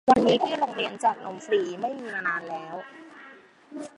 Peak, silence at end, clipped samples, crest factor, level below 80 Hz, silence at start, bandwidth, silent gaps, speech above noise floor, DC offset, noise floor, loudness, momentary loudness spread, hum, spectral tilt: -4 dBFS; 0.1 s; under 0.1%; 22 dB; -62 dBFS; 0.05 s; 11.5 kHz; none; 24 dB; under 0.1%; -50 dBFS; -26 LUFS; 22 LU; none; -4.5 dB/octave